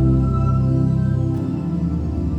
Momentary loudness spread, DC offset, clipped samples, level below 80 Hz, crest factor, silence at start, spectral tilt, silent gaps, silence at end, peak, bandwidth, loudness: 5 LU; under 0.1%; under 0.1%; -28 dBFS; 12 dB; 0 s; -10.5 dB/octave; none; 0 s; -6 dBFS; 5.2 kHz; -20 LUFS